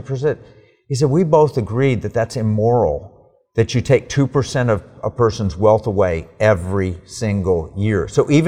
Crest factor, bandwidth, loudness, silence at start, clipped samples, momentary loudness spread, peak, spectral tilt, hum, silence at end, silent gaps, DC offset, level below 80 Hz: 16 dB; 11 kHz; -18 LUFS; 0 s; under 0.1%; 7 LU; -2 dBFS; -7 dB/octave; none; 0 s; none; 0.3%; -40 dBFS